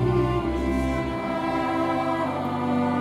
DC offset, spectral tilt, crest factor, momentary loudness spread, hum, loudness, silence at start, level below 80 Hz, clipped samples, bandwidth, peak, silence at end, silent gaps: under 0.1%; -7.5 dB/octave; 14 dB; 3 LU; none; -25 LUFS; 0 s; -36 dBFS; under 0.1%; 14.5 kHz; -10 dBFS; 0 s; none